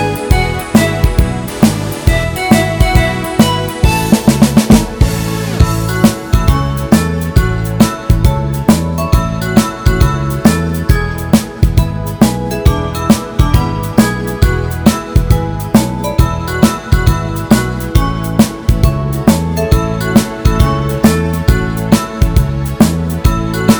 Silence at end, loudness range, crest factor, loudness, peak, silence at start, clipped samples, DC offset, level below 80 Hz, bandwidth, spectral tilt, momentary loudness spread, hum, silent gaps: 0 s; 2 LU; 12 dB; -13 LUFS; 0 dBFS; 0 s; 1%; under 0.1%; -18 dBFS; over 20 kHz; -6 dB/octave; 4 LU; none; none